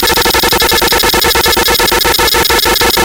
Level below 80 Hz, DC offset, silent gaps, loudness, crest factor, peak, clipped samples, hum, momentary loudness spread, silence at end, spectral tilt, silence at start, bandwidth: -26 dBFS; under 0.1%; none; -8 LUFS; 8 dB; 0 dBFS; under 0.1%; none; 0 LU; 0 s; -1.5 dB/octave; 0 s; 18 kHz